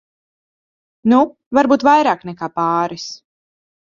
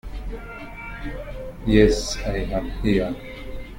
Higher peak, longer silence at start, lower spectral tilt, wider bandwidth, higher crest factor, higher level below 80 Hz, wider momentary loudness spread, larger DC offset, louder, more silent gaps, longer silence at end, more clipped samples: about the same, 0 dBFS vs -2 dBFS; first, 1.05 s vs 0.05 s; about the same, -5.5 dB/octave vs -5.5 dB/octave; second, 7.4 kHz vs 16.5 kHz; about the same, 18 dB vs 22 dB; second, -58 dBFS vs -32 dBFS; second, 13 LU vs 19 LU; neither; first, -16 LUFS vs -23 LUFS; first, 1.46-1.51 s vs none; first, 0.8 s vs 0 s; neither